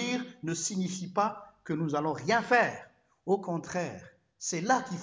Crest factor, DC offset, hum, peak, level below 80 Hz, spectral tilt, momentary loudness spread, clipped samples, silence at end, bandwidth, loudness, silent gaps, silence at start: 20 dB; under 0.1%; none; -10 dBFS; -70 dBFS; -4 dB/octave; 13 LU; under 0.1%; 0 s; 8 kHz; -31 LUFS; none; 0 s